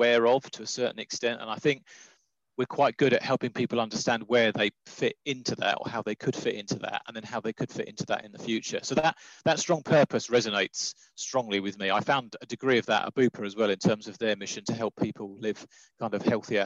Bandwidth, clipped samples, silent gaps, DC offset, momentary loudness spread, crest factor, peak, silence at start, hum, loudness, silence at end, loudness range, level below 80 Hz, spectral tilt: 8.4 kHz; under 0.1%; none; under 0.1%; 10 LU; 18 dB; -10 dBFS; 0 s; none; -28 LUFS; 0 s; 4 LU; -72 dBFS; -4 dB/octave